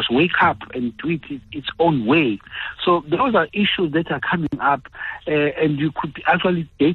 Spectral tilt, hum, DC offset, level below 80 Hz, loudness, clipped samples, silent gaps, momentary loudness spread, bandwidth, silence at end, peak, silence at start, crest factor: -8.5 dB/octave; none; under 0.1%; -50 dBFS; -20 LUFS; under 0.1%; none; 10 LU; 4.4 kHz; 0 s; -6 dBFS; 0 s; 14 dB